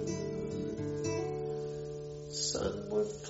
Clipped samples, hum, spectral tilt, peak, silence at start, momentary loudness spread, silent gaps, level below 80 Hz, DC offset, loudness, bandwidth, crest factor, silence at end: under 0.1%; none; -5.5 dB/octave; -22 dBFS; 0 s; 7 LU; none; -58 dBFS; under 0.1%; -37 LUFS; 8 kHz; 14 dB; 0 s